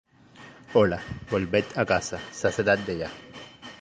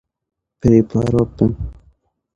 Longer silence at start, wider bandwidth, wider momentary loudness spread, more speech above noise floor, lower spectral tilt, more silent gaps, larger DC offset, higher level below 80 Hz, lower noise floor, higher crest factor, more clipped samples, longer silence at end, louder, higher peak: second, 0.4 s vs 0.65 s; first, 9.8 kHz vs 8.4 kHz; first, 20 LU vs 13 LU; second, 24 dB vs 41 dB; second, -5 dB/octave vs -9.5 dB/octave; neither; neither; second, -52 dBFS vs -36 dBFS; second, -50 dBFS vs -56 dBFS; about the same, 20 dB vs 18 dB; neither; second, 0.05 s vs 0.65 s; second, -26 LUFS vs -16 LUFS; second, -6 dBFS vs 0 dBFS